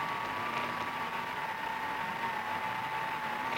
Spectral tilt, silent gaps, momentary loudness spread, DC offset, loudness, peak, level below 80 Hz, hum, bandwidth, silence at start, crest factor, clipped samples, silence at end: -3.5 dB/octave; none; 2 LU; under 0.1%; -35 LUFS; -20 dBFS; -68 dBFS; none; 17 kHz; 0 s; 16 dB; under 0.1%; 0 s